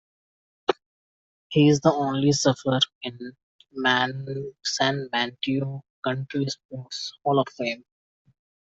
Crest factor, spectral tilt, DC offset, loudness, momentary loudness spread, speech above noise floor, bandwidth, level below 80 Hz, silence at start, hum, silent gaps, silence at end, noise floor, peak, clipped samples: 22 dB; -4.5 dB/octave; under 0.1%; -25 LUFS; 14 LU; over 66 dB; 8 kHz; -64 dBFS; 0.7 s; none; 0.86-1.50 s, 2.95-3.01 s, 3.43-3.59 s, 5.90-6.02 s, 6.65-6.69 s; 0.9 s; under -90 dBFS; -4 dBFS; under 0.1%